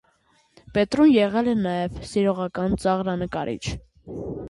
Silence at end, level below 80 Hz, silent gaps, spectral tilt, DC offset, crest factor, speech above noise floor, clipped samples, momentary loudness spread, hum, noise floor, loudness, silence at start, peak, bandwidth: 0 s; -46 dBFS; none; -6.5 dB/octave; under 0.1%; 16 dB; 41 dB; under 0.1%; 16 LU; none; -63 dBFS; -23 LUFS; 0.75 s; -8 dBFS; 11.5 kHz